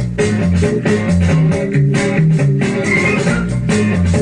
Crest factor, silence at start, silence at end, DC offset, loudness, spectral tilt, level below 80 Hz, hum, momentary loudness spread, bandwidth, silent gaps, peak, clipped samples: 10 dB; 0 s; 0 s; under 0.1%; -14 LUFS; -7 dB/octave; -32 dBFS; none; 3 LU; 10.5 kHz; none; -4 dBFS; under 0.1%